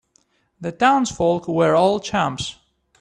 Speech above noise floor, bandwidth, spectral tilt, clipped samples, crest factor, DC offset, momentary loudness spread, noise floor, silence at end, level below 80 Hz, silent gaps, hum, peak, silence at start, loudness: 44 dB; 10.5 kHz; -5 dB/octave; under 0.1%; 18 dB; under 0.1%; 14 LU; -63 dBFS; 0.45 s; -52 dBFS; none; none; -2 dBFS; 0.6 s; -19 LUFS